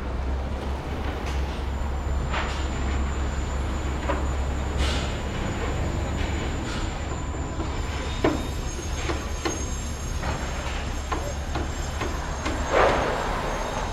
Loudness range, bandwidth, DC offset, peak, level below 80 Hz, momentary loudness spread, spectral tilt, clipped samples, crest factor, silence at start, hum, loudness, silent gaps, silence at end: 3 LU; 13.5 kHz; under 0.1%; -6 dBFS; -30 dBFS; 5 LU; -5 dB/octave; under 0.1%; 20 dB; 0 s; none; -28 LUFS; none; 0 s